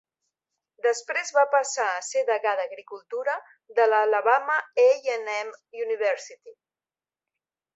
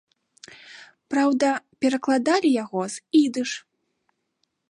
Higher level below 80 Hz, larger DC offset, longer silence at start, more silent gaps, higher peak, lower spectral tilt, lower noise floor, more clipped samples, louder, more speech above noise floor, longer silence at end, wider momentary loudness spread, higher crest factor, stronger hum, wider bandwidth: second, -86 dBFS vs -76 dBFS; neither; first, 0.85 s vs 0.7 s; neither; about the same, -6 dBFS vs -8 dBFS; second, 1 dB/octave vs -4 dB/octave; first, under -90 dBFS vs -75 dBFS; neither; about the same, -24 LUFS vs -23 LUFS; first, over 65 dB vs 53 dB; first, 1.25 s vs 1.1 s; about the same, 13 LU vs 11 LU; about the same, 20 dB vs 16 dB; neither; second, 8.2 kHz vs 11 kHz